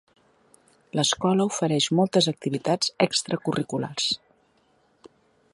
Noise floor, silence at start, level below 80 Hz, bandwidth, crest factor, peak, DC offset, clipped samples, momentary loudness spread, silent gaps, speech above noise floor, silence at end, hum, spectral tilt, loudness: -64 dBFS; 0.95 s; -66 dBFS; 11.5 kHz; 20 dB; -6 dBFS; under 0.1%; under 0.1%; 7 LU; none; 40 dB; 0.45 s; none; -4 dB/octave; -24 LUFS